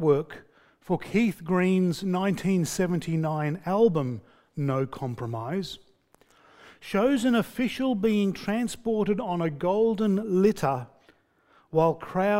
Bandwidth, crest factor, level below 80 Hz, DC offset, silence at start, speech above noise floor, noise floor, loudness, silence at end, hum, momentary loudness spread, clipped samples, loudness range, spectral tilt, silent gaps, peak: 16 kHz; 16 dB; -58 dBFS; under 0.1%; 0 s; 37 dB; -62 dBFS; -26 LUFS; 0 s; none; 10 LU; under 0.1%; 4 LU; -6.5 dB/octave; none; -10 dBFS